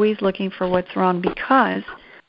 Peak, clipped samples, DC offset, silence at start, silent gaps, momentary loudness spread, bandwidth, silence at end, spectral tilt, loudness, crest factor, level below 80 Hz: -2 dBFS; under 0.1%; under 0.1%; 0 s; none; 8 LU; 5.6 kHz; 0.3 s; -10 dB/octave; -20 LUFS; 18 dB; -52 dBFS